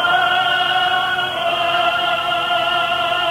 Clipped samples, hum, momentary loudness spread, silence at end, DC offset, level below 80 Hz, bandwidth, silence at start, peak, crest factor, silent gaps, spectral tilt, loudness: under 0.1%; none; 3 LU; 0 s; under 0.1%; -54 dBFS; 17 kHz; 0 s; -4 dBFS; 14 dB; none; -2.5 dB/octave; -16 LUFS